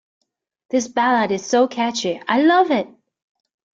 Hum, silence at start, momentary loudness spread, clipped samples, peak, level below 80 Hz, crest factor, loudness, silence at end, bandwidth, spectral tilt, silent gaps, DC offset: none; 0.75 s; 8 LU; under 0.1%; -4 dBFS; -66 dBFS; 16 dB; -18 LUFS; 0.9 s; 7.8 kHz; -3.5 dB/octave; none; under 0.1%